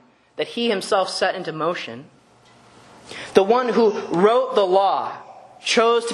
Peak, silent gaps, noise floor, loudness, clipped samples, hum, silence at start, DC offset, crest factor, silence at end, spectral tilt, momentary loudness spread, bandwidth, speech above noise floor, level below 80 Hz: 0 dBFS; none; -52 dBFS; -20 LUFS; under 0.1%; none; 0.4 s; under 0.1%; 20 dB; 0 s; -4 dB/octave; 17 LU; 12 kHz; 33 dB; -68 dBFS